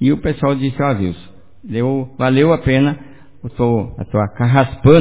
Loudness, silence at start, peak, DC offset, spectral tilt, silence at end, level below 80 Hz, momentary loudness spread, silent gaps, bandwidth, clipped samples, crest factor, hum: -16 LUFS; 0 s; 0 dBFS; 1%; -12 dB/octave; 0 s; -36 dBFS; 12 LU; none; 4 kHz; under 0.1%; 16 dB; none